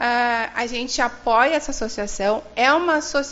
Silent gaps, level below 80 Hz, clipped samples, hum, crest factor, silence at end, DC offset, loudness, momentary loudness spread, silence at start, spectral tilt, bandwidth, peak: none; -42 dBFS; under 0.1%; none; 18 dB; 0 s; under 0.1%; -20 LUFS; 8 LU; 0 s; -0.5 dB/octave; 8 kHz; -4 dBFS